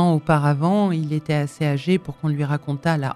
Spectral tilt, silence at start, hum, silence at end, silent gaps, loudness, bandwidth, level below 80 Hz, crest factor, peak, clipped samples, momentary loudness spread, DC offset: -7.5 dB/octave; 0 s; none; 0 s; none; -21 LUFS; 12 kHz; -52 dBFS; 16 dB; -4 dBFS; under 0.1%; 6 LU; under 0.1%